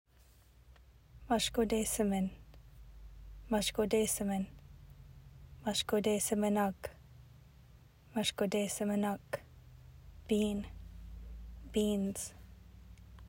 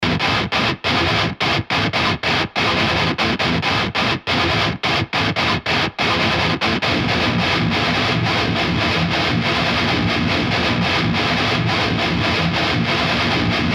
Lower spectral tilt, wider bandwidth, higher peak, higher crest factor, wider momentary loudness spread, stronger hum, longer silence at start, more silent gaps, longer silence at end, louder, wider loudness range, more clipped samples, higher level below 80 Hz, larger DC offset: about the same, -4 dB/octave vs -5 dB/octave; first, 16 kHz vs 14.5 kHz; second, -18 dBFS vs -4 dBFS; about the same, 18 dB vs 14 dB; first, 25 LU vs 1 LU; neither; first, 0.7 s vs 0 s; neither; about the same, 0 s vs 0 s; second, -35 LUFS vs -17 LUFS; first, 4 LU vs 0 LU; neither; second, -54 dBFS vs -38 dBFS; neither